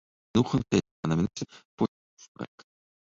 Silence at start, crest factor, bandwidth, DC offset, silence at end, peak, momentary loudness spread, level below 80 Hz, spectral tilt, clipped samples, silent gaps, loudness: 0.35 s; 20 dB; 7.8 kHz; under 0.1%; 0.6 s; -10 dBFS; 16 LU; -54 dBFS; -6.5 dB/octave; under 0.1%; 0.91-1.03 s, 1.65-1.78 s, 1.88-2.17 s, 2.28-2.35 s; -29 LUFS